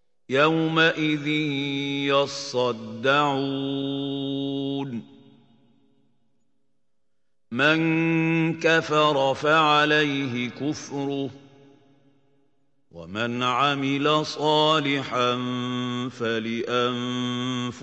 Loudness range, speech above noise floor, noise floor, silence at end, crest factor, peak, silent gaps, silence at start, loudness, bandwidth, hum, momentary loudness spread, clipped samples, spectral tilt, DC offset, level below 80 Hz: 10 LU; 58 dB; -81 dBFS; 0 s; 20 dB; -6 dBFS; none; 0.3 s; -23 LUFS; 8.4 kHz; none; 9 LU; under 0.1%; -5 dB/octave; under 0.1%; -74 dBFS